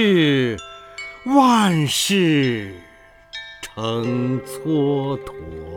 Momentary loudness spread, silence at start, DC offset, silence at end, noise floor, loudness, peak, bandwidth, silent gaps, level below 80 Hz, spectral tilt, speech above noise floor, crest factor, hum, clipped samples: 19 LU; 0 s; under 0.1%; 0 s; -44 dBFS; -19 LUFS; -2 dBFS; 19.5 kHz; none; -50 dBFS; -5 dB/octave; 26 dB; 18 dB; none; under 0.1%